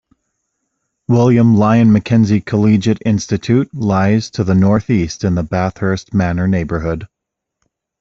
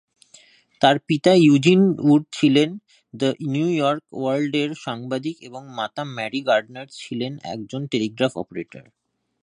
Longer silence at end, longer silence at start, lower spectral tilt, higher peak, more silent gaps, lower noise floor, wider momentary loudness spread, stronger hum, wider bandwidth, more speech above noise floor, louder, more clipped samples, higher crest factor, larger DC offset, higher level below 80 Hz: first, 0.95 s vs 0.6 s; first, 1.1 s vs 0.8 s; first, -7.5 dB/octave vs -6 dB/octave; about the same, -2 dBFS vs 0 dBFS; neither; first, -72 dBFS vs -53 dBFS; second, 8 LU vs 17 LU; neither; second, 7.6 kHz vs 10.5 kHz; first, 59 dB vs 32 dB; first, -14 LUFS vs -21 LUFS; neither; second, 14 dB vs 20 dB; neither; first, -42 dBFS vs -66 dBFS